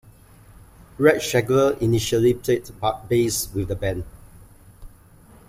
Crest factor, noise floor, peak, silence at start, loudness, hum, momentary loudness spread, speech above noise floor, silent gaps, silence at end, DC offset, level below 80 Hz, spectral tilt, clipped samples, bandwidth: 20 dB; -49 dBFS; -2 dBFS; 1 s; -21 LUFS; none; 8 LU; 29 dB; none; 0.6 s; under 0.1%; -44 dBFS; -5 dB/octave; under 0.1%; 16 kHz